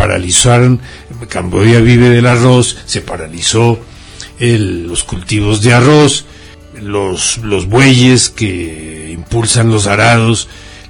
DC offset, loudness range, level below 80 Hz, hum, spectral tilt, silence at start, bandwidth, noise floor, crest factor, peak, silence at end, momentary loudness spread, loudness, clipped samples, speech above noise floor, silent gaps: under 0.1%; 3 LU; -32 dBFS; none; -4.5 dB/octave; 0 s; 11 kHz; -30 dBFS; 10 dB; 0 dBFS; 0.1 s; 16 LU; -10 LUFS; 0.2%; 20 dB; none